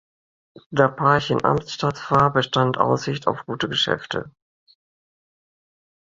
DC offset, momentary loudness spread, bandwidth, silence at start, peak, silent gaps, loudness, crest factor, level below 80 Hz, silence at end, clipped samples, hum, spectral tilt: under 0.1%; 8 LU; 7.6 kHz; 0.7 s; -2 dBFS; none; -21 LUFS; 22 dB; -54 dBFS; 1.75 s; under 0.1%; none; -5.5 dB/octave